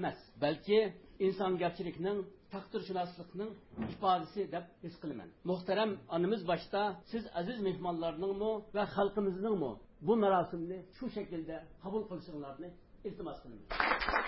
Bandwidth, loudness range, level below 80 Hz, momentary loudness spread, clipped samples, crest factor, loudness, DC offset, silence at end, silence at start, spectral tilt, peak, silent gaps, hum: 5.6 kHz; 4 LU; -60 dBFS; 14 LU; under 0.1%; 22 dB; -36 LUFS; under 0.1%; 0 s; 0 s; -4 dB/octave; -14 dBFS; none; none